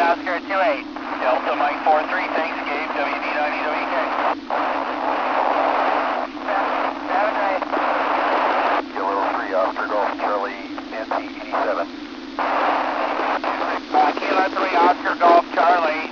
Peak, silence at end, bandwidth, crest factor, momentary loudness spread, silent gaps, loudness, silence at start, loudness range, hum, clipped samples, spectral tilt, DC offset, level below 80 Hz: -4 dBFS; 0 s; 7 kHz; 16 dB; 8 LU; none; -21 LUFS; 0 s; 5 LU; none; under 0.1%; -4 dB/octave; under 0.1%; -58 dBFS